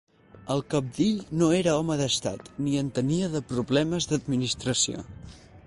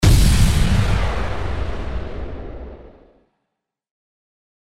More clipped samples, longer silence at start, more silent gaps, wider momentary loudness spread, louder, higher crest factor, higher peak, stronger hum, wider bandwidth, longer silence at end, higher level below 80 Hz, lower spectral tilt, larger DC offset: neither; first, 0.35 s vs 0 s; neither; second, 8 LU vs 19 LU; second, -26 LUFS vs -20 LUFS; about the same, 16 dB vs 18 dB; second, -10 dBFS vs -2 dBFS; neither; second, 11.5 kHz vs 16 kHz; second, 0.05 s vs 0.85 s; second, -54 dBFS vs -22 dBFS; about the same, -4.5 dB/octave vs -5.5 dB/octave; neither